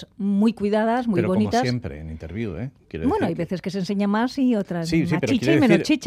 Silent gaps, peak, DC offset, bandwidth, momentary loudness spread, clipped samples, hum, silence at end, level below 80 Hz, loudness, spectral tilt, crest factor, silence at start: none; -4 dBFS; under 0.1%; 14 kHz; 12 LU; under 0.1%; none; 0 s; -50 dBFS; -22 LUFS; -6.5 dB/octave; 18 dB; 0 s